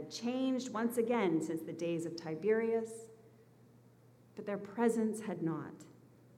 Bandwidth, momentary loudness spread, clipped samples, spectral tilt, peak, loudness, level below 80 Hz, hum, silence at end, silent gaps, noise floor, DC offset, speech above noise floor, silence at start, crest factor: 15.5 kHz; 15 LU; under 0.1%; -6 dB/octave; -20 dBFS; -36 LUFS; -84 dBFS; none; 0.4 s; none; -63 dBFS; under 0.1%; 27 dB; 0 s; 18 dB